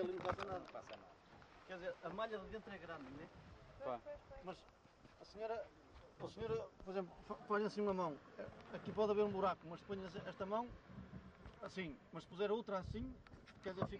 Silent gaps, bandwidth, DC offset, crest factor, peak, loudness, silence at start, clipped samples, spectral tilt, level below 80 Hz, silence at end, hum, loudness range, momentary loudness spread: none; 9 kHz; under 0.1%; 20 dB; -26 dBFS; -46 LUFS; 0 s; under 0.1%; -6.5 dB/octave; -66 dBFS; 0 s; none; 9 LU; 18 LU